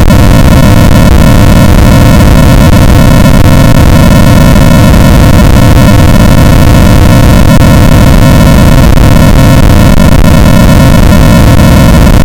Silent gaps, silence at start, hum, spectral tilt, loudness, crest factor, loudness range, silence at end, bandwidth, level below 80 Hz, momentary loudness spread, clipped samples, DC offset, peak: none; 0 s; none; -6.5 dB/octave; -3 LUFS; 0 dB; 0 LU; 0 s; over 20 kHz; -6 dBFS; 1 LU; 40%; under 0.1%; 0 dBFS